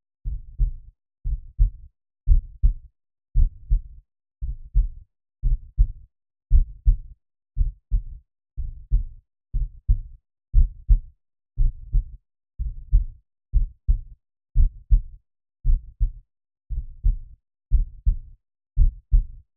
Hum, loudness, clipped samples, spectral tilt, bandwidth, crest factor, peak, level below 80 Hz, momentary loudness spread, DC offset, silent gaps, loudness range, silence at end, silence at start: none; -28 LUFS; under 0.1%; -19.5 dB/octave; 0.5 kHz; 18 dB; -4 dBFS; -24 dBFS; 13 LU; under 0.1%; none; 2 LU; 0.25 s; 0.25 s